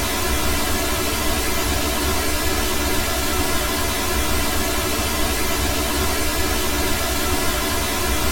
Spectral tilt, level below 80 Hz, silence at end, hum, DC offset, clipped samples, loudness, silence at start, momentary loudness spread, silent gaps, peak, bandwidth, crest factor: -3 dB/octave; -28 dBFS; 0 s; none; under 0.1%; under 0.1%; -20 LUFS; 0 s; 0 LU; none; -6 dBFS; 17.5 kHz; 14 dB